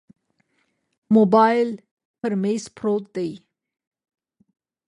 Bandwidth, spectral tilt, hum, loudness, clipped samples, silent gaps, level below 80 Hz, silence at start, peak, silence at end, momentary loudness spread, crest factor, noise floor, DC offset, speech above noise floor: 10.5 kHz; -7 dB/octave; none; -21 LUFS; under 0.1%; 1.91-1.97 s, 2.05-2.14 s; -70 dBFS; 1.1 s; -4 dBFS; 1.5 s; 14 LU; 18 dB; -70 dBFS; under 0.1%; 51 dB